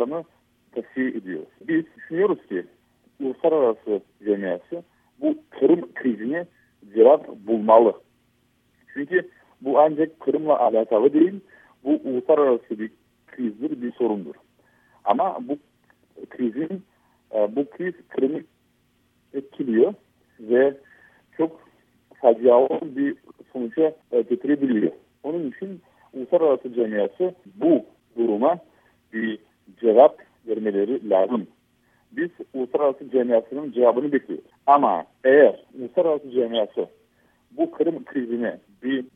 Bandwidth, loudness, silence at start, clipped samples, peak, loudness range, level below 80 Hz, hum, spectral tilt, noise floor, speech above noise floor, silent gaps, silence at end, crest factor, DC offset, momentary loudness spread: 3.8 kHz; -22 LUFS; 0 s; under 0.1%; -2 dBFS; 8 LU; -74 dBFS; none; -9 dB/octave; -65 dBFS; 43 dB; none; 0.1 s; 22 dB; under 0.1%; 17 LU